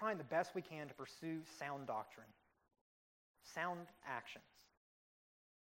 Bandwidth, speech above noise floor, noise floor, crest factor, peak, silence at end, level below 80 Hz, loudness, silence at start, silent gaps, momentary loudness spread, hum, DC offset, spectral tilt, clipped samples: 16 kHz; over 43 dB; under -90 dBFS; 22 dB; -28 dBFS; 1.1 s; -88 dBFS; -46 LUFS; 0 s; 2.81-3.34 s; 16 LU; none; under 0.1%; -5 dB/octave; under 0.1%